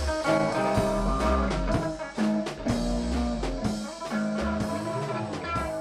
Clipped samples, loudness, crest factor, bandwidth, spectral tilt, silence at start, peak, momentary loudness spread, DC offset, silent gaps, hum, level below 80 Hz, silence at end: under 0.1%; -28 LUFS; 14 dB; 14 kHz; -6 dB/octave; 0 s; -12 dBFS; 6 LU; under 0.1%; none; none; -36 dBFS; 0 s